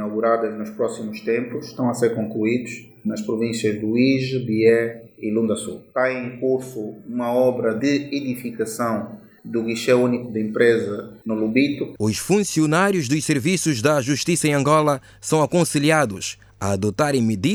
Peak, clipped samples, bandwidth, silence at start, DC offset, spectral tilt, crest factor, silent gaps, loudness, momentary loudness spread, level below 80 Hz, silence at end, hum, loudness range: -2 dBFS; under 0.1%; over 20 kHz; 0 s; under 0.1%; -5 dB/octave; 18 dB; none; -21 LUFS; 11 LU; -58 dBFS; 0 s; none; 4 LU